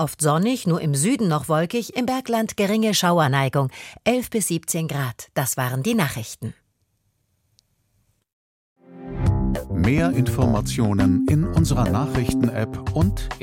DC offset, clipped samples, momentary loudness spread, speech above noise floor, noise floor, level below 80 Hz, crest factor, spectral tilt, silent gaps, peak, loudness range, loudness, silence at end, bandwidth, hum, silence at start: under 0.1%; under 0.1%; 7 LU; 48 dB; -69 dBFS; -36 dBFS; 18 dB; -5.5 dB/octave; 8.33-8.76 s; -4 dBFS; 9 LU; -21 LUFS; 0 s; 16.5 kHz; none; 0 s